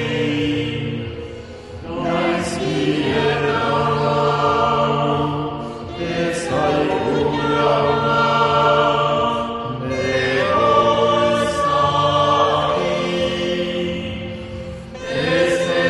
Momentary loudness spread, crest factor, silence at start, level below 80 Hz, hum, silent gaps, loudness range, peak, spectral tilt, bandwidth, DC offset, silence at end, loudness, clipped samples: 13 LU; 16 dB; 0 s; -42 dBFS; none; none; 4 LU; -2 dBFS; -5.5 dB/octave; 11.5 kHz; under 0.1%; 0 s; -18 LUFS; under 0.1%